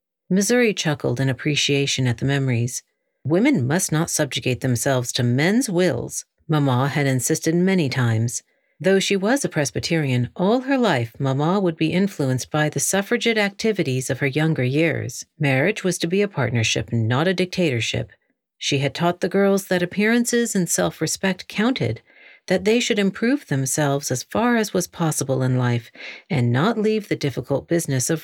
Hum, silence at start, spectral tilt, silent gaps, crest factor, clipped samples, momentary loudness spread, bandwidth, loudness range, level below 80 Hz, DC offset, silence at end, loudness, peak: none; 0.3 s; -5 dB/octave; none; 16 dB; under 0.1%; 5 LU; 17.5 kHz; 1 LU; -56 dBFS; under 0.1%; 0 s; -21 LUFS; -4 dBFS